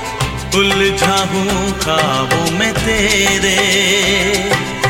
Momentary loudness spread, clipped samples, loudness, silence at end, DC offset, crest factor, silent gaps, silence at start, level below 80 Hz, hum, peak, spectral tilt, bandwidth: 5 LU; under 0.1%; -13 LUFS; 0 s; under 0.1%; 14 dB; none; 0 s; -32 dBFS; none; 0 dBFS; -3 dB/octave; 17 kHz